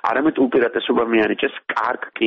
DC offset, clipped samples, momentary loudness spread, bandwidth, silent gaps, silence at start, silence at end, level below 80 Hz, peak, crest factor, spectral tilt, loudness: under 0.1%; under 0.1%; 5 LU; 6.2 kHz; none; 0.05 s; 0 s; -56 dBFS; -6 dBFS; 14 dB; -2 dB/octave; -19 LUFS